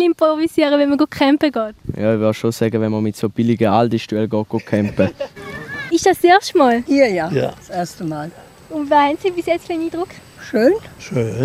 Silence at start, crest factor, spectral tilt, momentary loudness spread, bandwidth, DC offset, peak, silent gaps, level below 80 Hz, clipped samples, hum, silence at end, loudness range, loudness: 0 s; 16 dB; -6 dB/octave; 12 LU; 15.5 kHz; under 0.1%; 0 dBFS; none; -50 dBFS; under 0.1%; none; 0 s; 3 LU; -17 LUFS